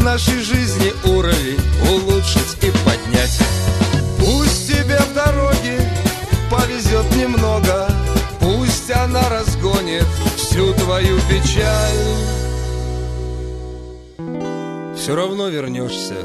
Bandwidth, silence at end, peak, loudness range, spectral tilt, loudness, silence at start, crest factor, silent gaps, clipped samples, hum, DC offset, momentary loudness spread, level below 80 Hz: 13.5 kHz; 0 s; 0 dBFS; 7 LU; -5 dB/octave; -17 LUFS; 0 s; 16 dB; none; under 0.1%; none; under 0.1%; 9 LU; -22 dBFS